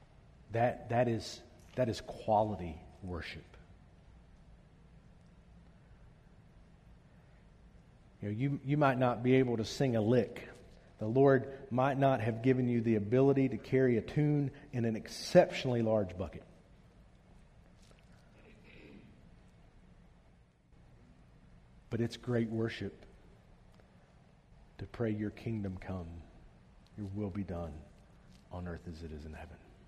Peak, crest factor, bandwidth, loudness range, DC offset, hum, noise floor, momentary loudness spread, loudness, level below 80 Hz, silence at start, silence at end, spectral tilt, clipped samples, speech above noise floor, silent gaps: -12 dBFS; 24 dB; 13.5 kHz; 14 LU; under 0.1%; none; -64 dBFS; 20 LU; -33 LUFS; -60 dBFS; 0.5 s; 0.3 s; -7.5 dB/octave; under 0.1%; 32 dB; none